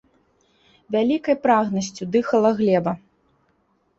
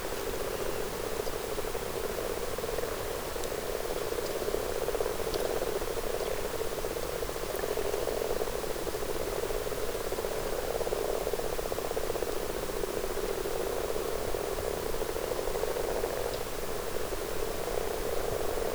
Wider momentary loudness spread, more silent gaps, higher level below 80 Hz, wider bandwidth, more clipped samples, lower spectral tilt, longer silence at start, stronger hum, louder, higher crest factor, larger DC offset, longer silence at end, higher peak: first, 8 LU vs 3 LU; neither; second, -62 dBFS vs -42 dBFS; second, 8 kHz vs over 20 kHz; neither; first, -6 dB/octave vs -3.5 dB/octave; first, 0.9 s vs 0 s; neither; first, -21 LUFS vs -33 LUFS; about the same, 18 dB vs 18 dB; neither; first, 1 s vs 0 s; first, -4 dBFS vs -14 dBFS